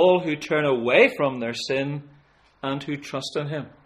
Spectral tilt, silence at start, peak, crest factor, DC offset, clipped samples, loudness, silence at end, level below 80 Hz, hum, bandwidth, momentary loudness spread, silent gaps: -5.5 dB/octave; 0 s; -4 dBFS; 20 dB; under 0.1%; under 0.1%; -23 LUFS; 0.15 s; -64 dBFS; none; 12.5 kHz; 13 LU; none